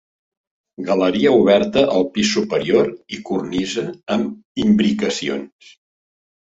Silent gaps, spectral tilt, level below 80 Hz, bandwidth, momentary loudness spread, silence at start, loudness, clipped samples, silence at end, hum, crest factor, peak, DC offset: 4.45-4.55 s; -5 dB/octave; -54 dBFS; 8 kHz; 11 LU; 0.8 s; -18 LUFS; under 0.1%; 1 s; none; 16 dB; -2 dBFS; under 0.1%